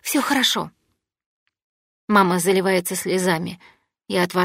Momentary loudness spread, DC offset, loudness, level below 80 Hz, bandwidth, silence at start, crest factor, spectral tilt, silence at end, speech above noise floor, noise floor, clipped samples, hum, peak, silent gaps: 11 LU; under 0.1%; -20 LUFS; -66 dBFS; 16 kHz; 0.05 s; 20 dB; -4 dB/octave; 0 s; 53 dB; -73 dBFS; under 0.1%; none; -2 dBFS; 1.26-1.46 s, 1.64-2.08 s